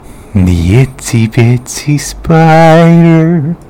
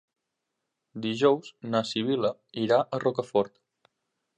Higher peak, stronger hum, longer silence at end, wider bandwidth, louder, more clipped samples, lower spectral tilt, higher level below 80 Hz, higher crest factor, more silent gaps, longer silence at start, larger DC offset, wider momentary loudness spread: first, 0 dBFS vs -8 dBFS; neither; second, 0.1 s vs 0.9 s; first, 15.5 kHz vs 9.4 kHz; first, -7 LUFS vs -27 LUFS; first, 8% vs under 0.1%; about the same, -7 dB/octave vs -6 dB/octave; first, -30 dBFS vs -74 dBFS; second, 8 dB vs 20 dB; neither; second, 0.1 s vs 0.95 s; neither; about the same, 10 LU vs 9 LU